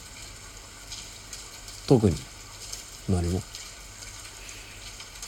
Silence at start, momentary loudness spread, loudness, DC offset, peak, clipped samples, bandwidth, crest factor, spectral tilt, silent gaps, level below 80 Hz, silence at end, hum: 0 s; 19 LU; -31 LUFS; under 0.1%; -6 dBFS; under 0.1%; 17.5 kHz; 26 dB; -5.5 dB/octave; none; -46 dBFS; 0 s; none